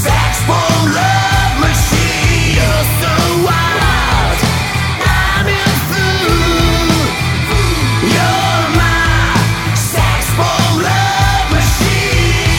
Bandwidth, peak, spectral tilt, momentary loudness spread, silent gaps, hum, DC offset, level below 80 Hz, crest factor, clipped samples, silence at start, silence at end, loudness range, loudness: 17.5 kHz; 0 dBFS; -4 dB/octave; 2 LU; none; none; under 0.1%; -20 dBFS; 12 dB; under 0.1%; 0 s; 0 s; 1 LU; -12 LUFS